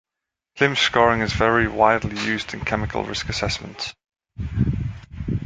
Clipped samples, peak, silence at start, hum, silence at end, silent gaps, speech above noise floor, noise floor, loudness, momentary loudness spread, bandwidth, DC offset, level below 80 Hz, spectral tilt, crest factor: under 0.1%; -2 dBFS; 0.55 s; none; 0 s; none; 64 dB; -85 dBFS; -21 LUFS; 14 LU; 9.4 kHz; under 0.1%; -38 dBFS; -5 dB/octave; 20 dB